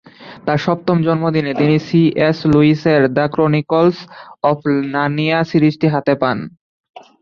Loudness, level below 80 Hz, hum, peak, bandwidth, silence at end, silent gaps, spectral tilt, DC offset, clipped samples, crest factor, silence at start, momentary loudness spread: -15 LUFS; -50 dBFS; none; -2 dBFS; 6.8 kHz; 0.25 s; 6.61-6.84 s; -8.5 dB/octave; under 0.1%; under 0.1%; 14 dB; 0.2 s; 6 LU